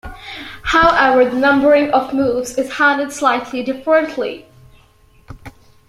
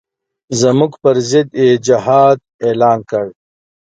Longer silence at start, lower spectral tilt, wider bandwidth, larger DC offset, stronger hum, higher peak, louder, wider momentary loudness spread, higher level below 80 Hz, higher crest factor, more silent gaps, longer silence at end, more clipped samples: second, 0.05 s vs 0.5 s; second, -4 dB/octave vs -5.5 dB/octave; first, 15 kHz vs 9.2 kHz; neither; neither; about the same, -2 dBFS vs 0 dBFS; about the same, -15 LUFS vs -13 LUFS; first, 14 LU vs 10 LU; first, -42 dBFS vs -56 dBFS; about the same, 14 dB vs 14 dB; second, none vs 2.54-2.59 s; second, 0.4 s vs 0.65 s; neither